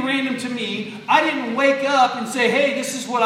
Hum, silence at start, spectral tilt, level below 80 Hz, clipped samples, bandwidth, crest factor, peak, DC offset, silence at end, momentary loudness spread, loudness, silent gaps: none; 0 s; -3 dB/octave; -78 dBFS; under 0.1%; 15.5 kHz; 18 dB; -2 dBFS; under 0.1%; 0 s; 8 LU; -19 LUFS; none